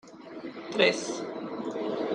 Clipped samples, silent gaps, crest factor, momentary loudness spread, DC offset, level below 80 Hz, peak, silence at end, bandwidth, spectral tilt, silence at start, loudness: under 0.1%; none; 24 dB; 17 LU; under 0.1%; -76 dBFS; -6 dBFS; 0 s; 11 kHz; -3.5 dB/octave; 0.05 s; -29 LUFS